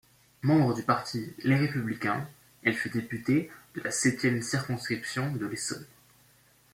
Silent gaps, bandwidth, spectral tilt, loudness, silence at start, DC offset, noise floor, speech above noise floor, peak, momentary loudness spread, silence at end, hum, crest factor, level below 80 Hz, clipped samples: none; 16.5 kHz; -5 dB/octave; -29 LUFS; 0.45 s; under 0.1%; -62 dBFS; 33 dB; -10 dBFS; 9 LU; 0.85 s; none; 20 dB; -66 dBFS; under 0.1%